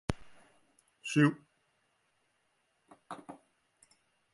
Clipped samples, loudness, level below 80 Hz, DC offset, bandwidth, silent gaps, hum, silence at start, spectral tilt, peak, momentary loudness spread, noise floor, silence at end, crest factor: under 0.1%; -31 LUFS; -58 dBFS; under 0.1%; 11.5 kHz; none; none; 0.1 s; -6 dB/octave; -12 dBFS; 24 LU; -77 dBFS; 1 s; 26 dB